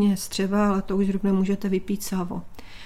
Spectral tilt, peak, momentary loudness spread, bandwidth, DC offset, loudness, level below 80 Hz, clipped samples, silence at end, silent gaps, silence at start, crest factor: -6 dB/octave; -12 dBFS; 7 LU; 15 kHz; under 0.1%; -25 LUFS; -44 dBFS; under 0.1%; 0 s; none; 0 s; 12 dB